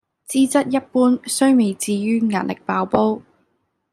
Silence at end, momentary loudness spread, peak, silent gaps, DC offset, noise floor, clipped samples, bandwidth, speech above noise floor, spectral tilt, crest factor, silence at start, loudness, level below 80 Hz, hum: 0.7 s; 7 LU; -2 dBFS; none; under 0.1%; -68 dBFS; under 0.1%; 14 kHz; 51 dB; -5 dB/octave; 16 dB; 0.3 s; -19 LUFS; -62 dBFS; none